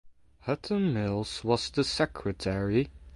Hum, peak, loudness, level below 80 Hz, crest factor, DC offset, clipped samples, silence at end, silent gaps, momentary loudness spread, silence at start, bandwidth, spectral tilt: none; -10 dBFS; -30 LUFS; -50 dBFS; 20 dB; under 0.1%; under 0.1%; 0 s; none; 6 LU; 0.05 s; 11.5 kHz; -5.5 dB/octave